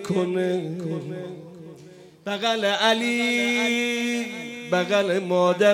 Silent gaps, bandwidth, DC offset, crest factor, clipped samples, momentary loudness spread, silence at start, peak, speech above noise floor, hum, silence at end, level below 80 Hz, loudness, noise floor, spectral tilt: none; 16.5 kHz; under 0.1%; 18 dB; under 0.1%; 17 LU; 0 s; -6 dBFS; 24 dB; none; 0 s; -76 dBFS; -23 LUFS; -47 dBFS; -4.5 dB/octave